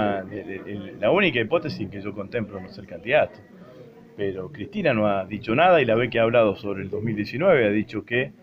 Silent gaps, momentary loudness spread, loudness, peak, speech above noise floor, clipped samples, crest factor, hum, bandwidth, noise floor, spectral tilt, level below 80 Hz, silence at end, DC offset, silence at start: none; 15 LU; -23 LUFS; -6 dBFS; 23 dB; under 0.1%; 18 dB; none; 6.6 kHz; -46 dBFS; -8 dB/octave; -56 dBFS; 0.1 s; under 0.1%; 0 s